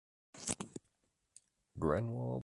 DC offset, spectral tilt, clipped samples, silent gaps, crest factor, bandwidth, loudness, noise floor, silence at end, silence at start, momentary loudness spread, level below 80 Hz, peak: under 0.1%; -5.5 dB/octave; under 0.1%; none; 22 dB; 11.5 kHz; -39 LUFS; -81 dBFS; 0 s; 0.35 s; 20 LU; -58 dBFS; -18 dBFS